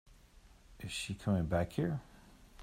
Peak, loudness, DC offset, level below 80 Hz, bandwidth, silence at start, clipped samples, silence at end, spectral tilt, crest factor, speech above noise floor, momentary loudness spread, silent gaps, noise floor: -20 dBFS; -37 LUFS; under 0.1%; -56 dBFS; 16 kHz; 0.1 s; under 0.1%; 0 s; -6 dB/octave; 20 dB; 26 dB; 10 LU; none; -61 dBFS